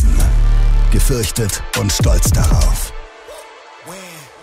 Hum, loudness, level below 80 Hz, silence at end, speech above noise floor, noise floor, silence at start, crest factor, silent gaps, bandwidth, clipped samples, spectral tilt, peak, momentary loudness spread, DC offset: none; -16 LUFS; -14 dBFS; 0.2 s; 24 dB; -37 dBFS; 0 s; 10 dB; none; 16 kHz; under 0.1%; -4.5 dB/octave; -2 dBFS; 21 LU; under 0.1%